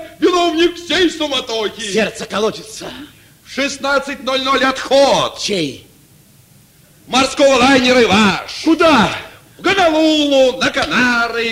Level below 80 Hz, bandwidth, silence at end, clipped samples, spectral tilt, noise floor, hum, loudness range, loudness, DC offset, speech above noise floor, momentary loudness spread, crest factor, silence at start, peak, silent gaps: -46 dBFS; 16 kHz; 0 s; under 0.1%; -3.5 dB/octave; -47 dBFS; none; 6 LU; -14 LUFS; under 0.1%; 33 dB; 10 LU; 14 dB; 0 s; 0 dBFS; none